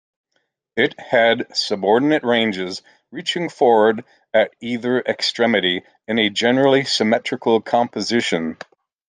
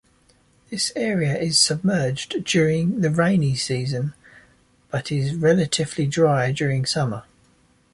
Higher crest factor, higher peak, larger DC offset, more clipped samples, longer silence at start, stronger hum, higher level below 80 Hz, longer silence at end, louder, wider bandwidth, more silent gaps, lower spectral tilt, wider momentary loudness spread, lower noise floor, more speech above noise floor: about the same, 16 dB vs 18 dB; about the same, -2 dBFS vs -4 dBFS; neither; neither; about the same, 0.75 s vs 0.7 s; neither; second, -66 dBFS vs -54 dBFS; second, 0.55 s vs 0.7 s; first, -18 LUFS vs -21 LUFS; second, 9.8 kHz vs 11.5 kHz; neither; about the same, -4 dB/octave vs -4.5 dB/octave; about the same, 11 LU vs 9 LU; first, -71 dBFS vs -59 dBFS; first, 53 dB vs 38 dB